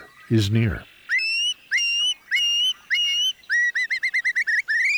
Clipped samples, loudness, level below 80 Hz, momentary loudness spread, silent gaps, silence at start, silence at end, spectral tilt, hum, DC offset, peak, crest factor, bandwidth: under 0.1%; -21 LUFS; -50 dBFS; 4 LU; none; 0 s; 0 s; -3 dB/octave; none; under 0.1%; -10 dBFS; 14 dB; over 20 kHz